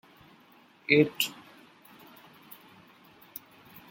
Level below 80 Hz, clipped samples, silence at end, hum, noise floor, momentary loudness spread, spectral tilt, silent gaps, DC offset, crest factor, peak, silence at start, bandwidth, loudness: -76 dBFS; under 0.1%; 2.6 s; none; -59 dBFS; 28 LU; -4.5 dB/octave; none; under 0.1%; 28 dB; -6 dBFS; 0.9 s; 17 kHz; -26 LUFS